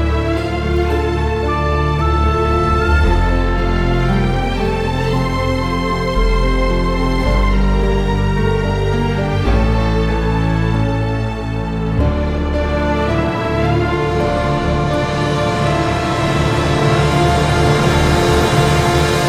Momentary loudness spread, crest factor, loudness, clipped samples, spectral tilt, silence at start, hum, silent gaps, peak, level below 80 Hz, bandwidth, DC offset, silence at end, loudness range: 5 LU; 14 dB; -16 LUFS; under 0.1%; -6.5 dB/octave; 0 s; none; none; 0 dBFS; -20 dBFS; 14.5 kHz; under 0.1%; 0 s; 3 LU